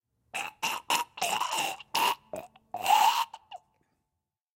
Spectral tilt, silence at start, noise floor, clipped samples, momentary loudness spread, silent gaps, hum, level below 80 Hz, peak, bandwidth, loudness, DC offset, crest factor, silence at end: 0 dB/octave; 0.35 s; -86 dBFS; under 0.1%; 19 LU; none; none; -78 dBFS; -10 dBFS; 17 kHz; -29 LUFS; under 0.1%; 20 dB; 1 s